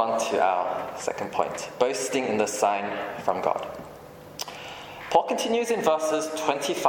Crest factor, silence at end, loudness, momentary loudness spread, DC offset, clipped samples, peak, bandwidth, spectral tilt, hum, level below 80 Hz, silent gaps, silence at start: 20 dB; 0 s; -26 LUFS; 14 LU; under 0.1%; under 0.1%; -6 dBFS; 17.5 kHz; -3 dB/octave; none; -64 dBFS; none; 0 s